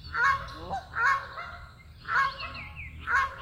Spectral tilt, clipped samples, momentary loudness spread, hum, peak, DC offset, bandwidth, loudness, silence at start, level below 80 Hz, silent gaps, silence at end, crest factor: -3 dB/octave; under 0.1%; 16 LU; none; -12 dBFS; under 0.1%; 16 kHz; -29 LUFS; 0 s; -50 dBFS; none; 0 s; 18 dB